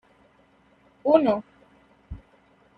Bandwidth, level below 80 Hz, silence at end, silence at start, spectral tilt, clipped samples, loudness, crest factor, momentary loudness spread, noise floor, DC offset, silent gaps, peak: 4.9 kHz; -54 dBFS; 0.6 s; 1.05 s; -8.5 dB/octave; under 0.1%; -23 LUFS; 22 dB; 25 LU; -60 dBFS; under 0.1%; none; -6 dBFS